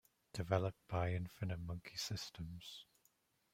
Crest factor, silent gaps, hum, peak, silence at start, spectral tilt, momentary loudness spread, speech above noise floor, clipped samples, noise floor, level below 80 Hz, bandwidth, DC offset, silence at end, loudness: 24 dB; none; none; -20 dBFS; 0.35 s; -5.5 dB/octave; 13 LU; 36 dB; under 0.1%; -78 dBFS; -64 dBFS; 16 kHz; under 0.1%; 0.7 s; -43 LUFS